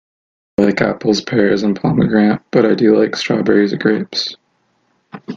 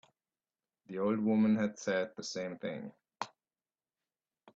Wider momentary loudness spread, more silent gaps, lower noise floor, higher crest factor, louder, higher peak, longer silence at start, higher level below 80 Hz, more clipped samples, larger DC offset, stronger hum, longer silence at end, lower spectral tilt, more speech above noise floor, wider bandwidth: second, 8 LU vs 16 LU; neither; second, -62 dBFS vs under -90 dBFS; about the same, 16 dB vs 18 dB; first, -15 LUFS vs -34 LUFS; first, 0 dBFS vs -20 dBFS; second, 0.6 s vs 0.9 s; first, -50 dBFS vs -78 dBFS; neither; neither; neither; second, 0 s vs 1.3 s; about the same, -6 dB/octave vs -5.5 dB/octave; second, 48 dB vs over 57 dB; about the same, 7.4 kHz vs 7.8 kHz